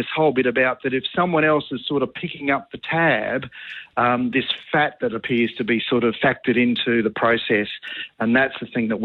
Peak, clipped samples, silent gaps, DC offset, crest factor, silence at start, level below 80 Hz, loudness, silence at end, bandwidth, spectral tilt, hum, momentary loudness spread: -6 dBFS; under 0.1%; none; under 0.1%; 14 dB; 0 s; -58 dBFS; -21 LUFS; 0 s; 4.5 kHz; -8 dB/octave; none; 8 LU